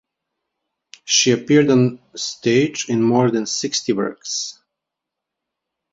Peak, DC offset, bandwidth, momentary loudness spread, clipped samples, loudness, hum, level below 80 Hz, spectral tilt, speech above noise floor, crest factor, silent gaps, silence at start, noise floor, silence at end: -2 dBFS; under 0.1%; 7.8 kHz; 11 LU; under 0.1%; -18 LUFS; none; -60 dBFS; -4 dB/octave; 65 dB; 18 dB; none; 1.05 s; -83 dBFS; 1.4 s